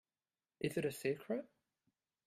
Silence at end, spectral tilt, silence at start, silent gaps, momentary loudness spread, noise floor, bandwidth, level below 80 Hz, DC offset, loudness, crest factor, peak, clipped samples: 0.8 s; -5.5 dB/octave; 0.6 s; none; 5 LU; under -90 dBFS; 15.5 kHz; -78 dBFS; under 0.1%; -41 LUFS; 20 dB; -24 dBFS; under 0.1%